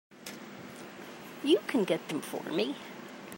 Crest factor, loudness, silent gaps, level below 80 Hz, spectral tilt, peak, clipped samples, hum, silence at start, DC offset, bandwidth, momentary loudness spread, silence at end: 20 dB; -31 LUFS; none; -80 dBFS; -4.5 dB/octave; -14 dBFS; under 0.1%; none; 0.1 s; under 0.1%; 16 kHz; 18 LU; 0 s